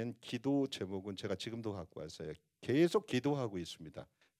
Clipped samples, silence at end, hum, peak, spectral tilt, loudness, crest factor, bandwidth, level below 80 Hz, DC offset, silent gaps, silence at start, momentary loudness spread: under 0.1%; 0.35 s; none; -18 dBFS; -6 dB/octave; -38 LUFS; 18 dB; 14 kHz; -74 dBFS; under 0.1%; none; 0 s; 16 LU